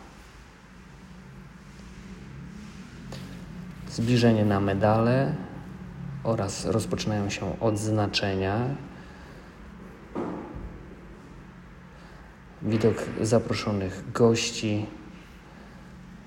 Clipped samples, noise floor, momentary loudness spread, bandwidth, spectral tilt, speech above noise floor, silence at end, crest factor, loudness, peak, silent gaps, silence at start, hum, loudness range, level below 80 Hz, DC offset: under 0.1%; -49 dBFS; 25 LU; 16 kHz; -6 dB/octave; 24 dB; 0 s; 20 dB; -26 LUFS; -8 dBFS; none; 0 s; none; 15 LU; -50 dBFS; under 0.1%